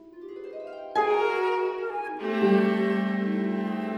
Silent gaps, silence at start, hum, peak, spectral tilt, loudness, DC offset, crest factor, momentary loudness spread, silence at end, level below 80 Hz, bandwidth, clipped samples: none; 0 s; none; -12 dBFS; -7.5 dB/octave; -26 LUFS; under 0.1%; 16 dB; 16 LU; 0 s; -74 dBFS; 8.4 kHz; under 0.1%